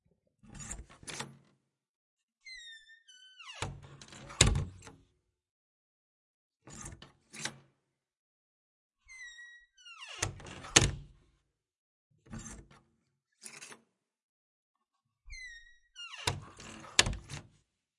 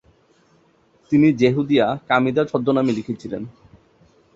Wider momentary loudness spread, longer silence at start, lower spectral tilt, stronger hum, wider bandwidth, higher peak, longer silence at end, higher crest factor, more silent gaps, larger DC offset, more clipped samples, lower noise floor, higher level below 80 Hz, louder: first, 27 LU vs 14 LU; second, 0.45 s vs 1.1 s; second, -2 dB/octave vs -7.5 dB/octave; neither; first, 11.5 kHz vs 7.6 kHz; about the same, -4 dBFS vs -2 dBFS; second, 0.55 s vs 0.85 s; first, 36 dB vs 18 dB; first, 1.89-2.17 s, 2.23-2.28 s, 5.51-6.50 s, 8.19-8.90 s, 11.78-12.10 s, 14.22-14.74 s vs none; neither; neither; first, -84 dBFS vs -58 dBFS; first, -50 dBFS vs -56 dBFS; second, -32 LUFS vs -19 LUFS